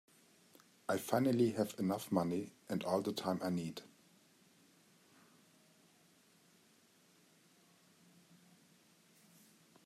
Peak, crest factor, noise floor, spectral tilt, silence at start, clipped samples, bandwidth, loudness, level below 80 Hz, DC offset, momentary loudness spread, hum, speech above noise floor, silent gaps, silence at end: -18 dBFS; 24 dB; -69 dBFS; -6 dB/octave; 0.9 s; under 0.1%; 15.5 kHz; -37 LUFS; -82 dBFS; under 0.1%; 10 LU; none; 33 dB; none; 6 s